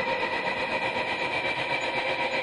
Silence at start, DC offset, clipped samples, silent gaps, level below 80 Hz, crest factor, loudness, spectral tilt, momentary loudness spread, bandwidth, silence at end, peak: 0 s; under 0.1%; under 0.1%; none; -60 dBFS; 14 dB; -27 LUFS; -3.5 dB/octave; 1 LU; 11.5 kHz; 0 s; -14 dBFS